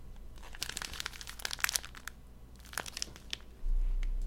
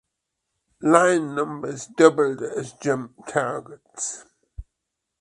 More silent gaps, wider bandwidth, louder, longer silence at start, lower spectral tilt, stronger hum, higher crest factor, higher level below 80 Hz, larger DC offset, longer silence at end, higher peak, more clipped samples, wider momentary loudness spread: neither; first, 17 kHz vs 11.5 kHz; second, -39 LUFS vs -22 LUFS; second, 0 s vs 0.8 s; second, -1 dB/octave vs -4.5 dB/octave; neither; first, 32 dB vs 22 dB; first, -38 dBFS vs -54 dBFS; neither; second, 0 s vs 0.6 s; second, -4 dBFS vs 0 dBFS; neither; first, 20 LU vs 15 LU